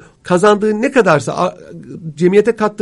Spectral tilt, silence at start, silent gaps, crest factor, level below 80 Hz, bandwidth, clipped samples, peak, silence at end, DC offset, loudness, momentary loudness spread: -6 dB/octave; 0.25 s; none; 14 dB; -54 dBFS; 11.5 kHz; under 0.1%; 0 dBFS; 0 s; under 0.1%; -13 LUFS; 15 LU